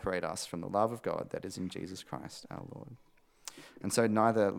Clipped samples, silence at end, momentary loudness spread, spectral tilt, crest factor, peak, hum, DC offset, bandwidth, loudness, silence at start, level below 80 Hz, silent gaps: under 0.1%; 0 s; 20 LU; -5 dB/octave; 22 dB; -12 dBFS; none; under 0.1%; 17 kHz; -34 LUFS; 0 s; -66 dBFS; none